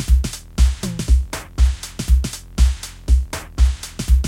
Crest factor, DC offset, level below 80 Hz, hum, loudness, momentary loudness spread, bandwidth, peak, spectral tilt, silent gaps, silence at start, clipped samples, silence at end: 14 dB; under 0.1%; -18 dBFS; none; -21 LUFS; 8 LU; 15 kHz; -2 dBFS; -5 dB/octave; none; 0 s; under 0.1%; 0 s